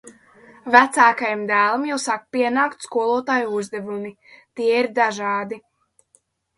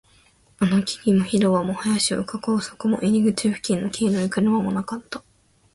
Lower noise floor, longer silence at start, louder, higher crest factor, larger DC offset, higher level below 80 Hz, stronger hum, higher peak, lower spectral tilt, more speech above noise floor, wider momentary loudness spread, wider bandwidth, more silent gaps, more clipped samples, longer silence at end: first, -62 dBFS vs -57 dBFS; second, 0.05 s vs 0.6 s; first, -19 LUFS vs -22 LUFS; first, 22 dB vs 14 dB; neither; second, -70 dBFS vs -56 dBFS; neither; first, 0 dBFS vs -8 dBFS; second, -3.5 dB/octave vs -5.5 dB/octave; first, 42 dB vs 36 dB; first, 16 LU vs 7 LU; about the same, 11.5 kHz vs 11.5 kHz; neither; neither; first, 1 s vs 0.55 s